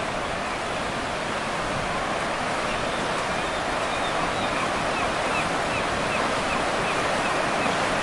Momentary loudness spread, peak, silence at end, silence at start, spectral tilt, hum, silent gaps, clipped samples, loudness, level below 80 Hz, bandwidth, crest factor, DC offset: 4 LU; -12 dBFS; 0 s; 0 s; -3.5 dB/octave; none; none; under 0.1%; -25 LUFS; -44 dBFS; 11.5 kHz; 14 dB; under 0.1%